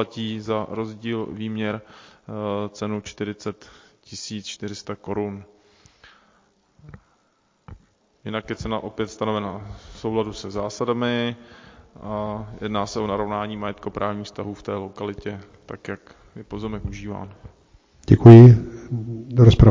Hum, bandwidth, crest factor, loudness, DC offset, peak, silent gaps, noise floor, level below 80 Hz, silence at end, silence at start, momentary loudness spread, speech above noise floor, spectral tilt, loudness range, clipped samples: none; 7.6 kHz; 20 dB; -20 LUFS; under 0.1%; 0 dBFS; none; -65 dBFS; -38 dBFS; 0 s; 0 s; 20 LU; 46 dB; -8 dB/octave; 20 LU; 0.2%